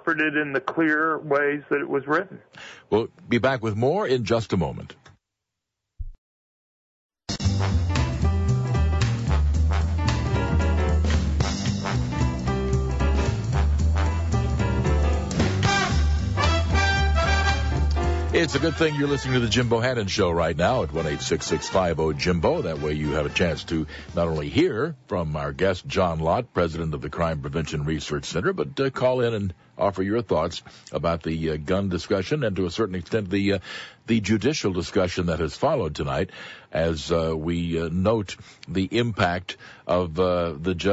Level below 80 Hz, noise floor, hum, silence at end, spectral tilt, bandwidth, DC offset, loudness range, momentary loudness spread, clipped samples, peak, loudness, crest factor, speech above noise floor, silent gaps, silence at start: -30 dBFS; -84 dBFS; none; 0 s; -6 dB/octave; 8 kHz; under 0.1%; 4 LU; 7 LU; under 0.1%; -10 dBFS; -24 LUFS; 14 dB; 59 dB; 6.18-7.09 s; 0.05 s